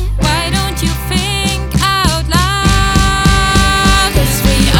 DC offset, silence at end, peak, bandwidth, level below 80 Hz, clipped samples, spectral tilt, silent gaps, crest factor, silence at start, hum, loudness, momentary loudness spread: under 0.1%; 0 s; 0 dBFS; 18.5 kHz; -16 dBFS; under 0.1%; -4 dB/octave; none; 12 dB; 0 s; none; -12 LUFS; 5 LU